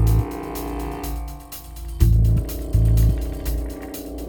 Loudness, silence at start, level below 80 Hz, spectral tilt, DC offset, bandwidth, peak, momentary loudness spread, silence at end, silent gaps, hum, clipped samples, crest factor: -23 LUFS; 0 s; -24 dBFS; -7 dB/octave; under 0.1%; over 20 kHz; -4 dBFS; 16 LU; 0 s; none; none; under 0.1%; 18 dB